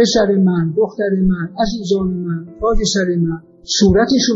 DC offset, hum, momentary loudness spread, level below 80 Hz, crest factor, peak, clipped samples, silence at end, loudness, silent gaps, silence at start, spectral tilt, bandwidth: under 0.1%; none; 8 LU; -30 dBFS; 14 dB; -2 dBFS; under 0.1%; 0 s; -16 LUFS; none; 0 s; -5 dB/octave; 7.8 kHz